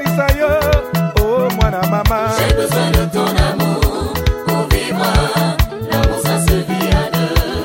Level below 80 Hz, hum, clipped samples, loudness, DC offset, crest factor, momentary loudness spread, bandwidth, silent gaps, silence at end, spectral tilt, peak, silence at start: -20 dBFS; none; under 0.1%; -15 LUFS; under 0.1%; 14 dB; 3 LU; 16.5 kHz; none; 0 s; -5.5 dB/octave; 0 dBFS; 0 s